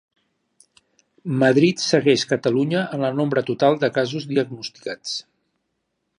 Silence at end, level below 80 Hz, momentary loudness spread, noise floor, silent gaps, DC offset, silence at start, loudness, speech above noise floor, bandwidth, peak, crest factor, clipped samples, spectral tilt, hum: 1 s; -68 dBFS; 13 LU; -75 dBFS; none; under 0.1%; 1.25 s; -21 LUFS; 55 dB; 11 kHz; -2 dBFS; 20 dB; under 0.1%; -5.5 dB/octave; none